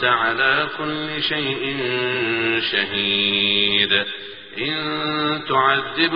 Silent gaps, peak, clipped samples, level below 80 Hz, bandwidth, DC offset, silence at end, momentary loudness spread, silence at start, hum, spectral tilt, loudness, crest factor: none; -4 dBFS; under 0.1%; -56 dBFS; 5.4 kHz; 0.3%; 0 s; 8 LU; 0 s; none; -0.5 dB/octave; -19 LUFS; 18 dB